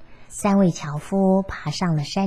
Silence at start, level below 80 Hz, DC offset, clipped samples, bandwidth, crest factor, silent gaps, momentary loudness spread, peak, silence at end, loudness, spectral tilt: 0 s; -46 dBFS; 0.6%; under 0.1%; 12.5 kHz; 14 dB; none; 10 LU; -6 dBFS; 0 s; -22 LUFS; -6.5 dB/octave